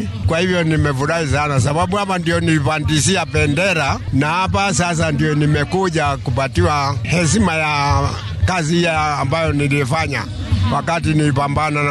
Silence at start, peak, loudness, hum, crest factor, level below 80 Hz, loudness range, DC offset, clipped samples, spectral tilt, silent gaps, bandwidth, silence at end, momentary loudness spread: 0 s; -2 dBFS; -17 LUFS; none; 14 dB; -34 dBFS; 1 LU; under 0.1%; under 0.1%; -5 dB/octave; none; 12.5 kHz; 0 s; 3 LU